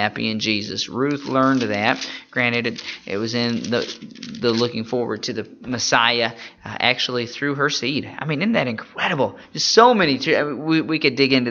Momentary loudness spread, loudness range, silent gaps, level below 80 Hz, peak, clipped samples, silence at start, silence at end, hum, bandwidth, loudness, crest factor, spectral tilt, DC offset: 10 LU; 4 LU; none; -60 dBFS; 0 dBFS; under 0.1%; 0 s; 0 s; none; 7.2 kHz; -20 LUFS; 20 dB; -4 dB/octave; under 0.1%